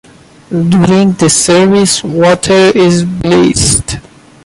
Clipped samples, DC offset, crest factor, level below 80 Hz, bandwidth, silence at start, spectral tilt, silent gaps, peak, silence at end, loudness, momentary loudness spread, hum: under 0.1%; under 0.1%; 8 dB; -32 dBFS; 11.5 kHz; 0.5 s; -4.5 dB/octave; none; 0 dBFS; 0.45 s; -8 LUFS; 6 LU; none